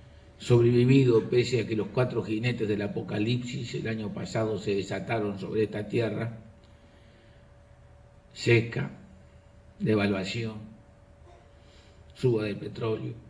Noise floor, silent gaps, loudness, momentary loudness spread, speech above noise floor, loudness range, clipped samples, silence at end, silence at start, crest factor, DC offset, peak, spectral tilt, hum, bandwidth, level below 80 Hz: -55 dBFS; none; -28 LUFS; 13 LU; 28 dB; 8 LU; under 0.1%; 0 s; 0 s; 20 dB; under 0.1%; -10 dBFS; -7 dB/octave; none; 10.5 kHz; -58 dBFS